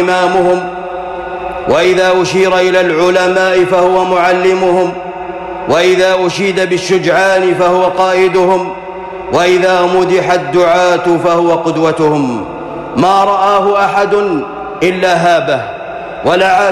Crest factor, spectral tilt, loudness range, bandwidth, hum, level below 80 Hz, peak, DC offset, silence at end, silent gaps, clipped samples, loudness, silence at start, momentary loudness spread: 8 dB; -5 dB/octave; 2 LU; 12.5 kHz; none; -44 dBFS; -2 dBFS; under 0.1%; 0 s; none; under 0.1%; -11 LUFS; 0 s; 12 LU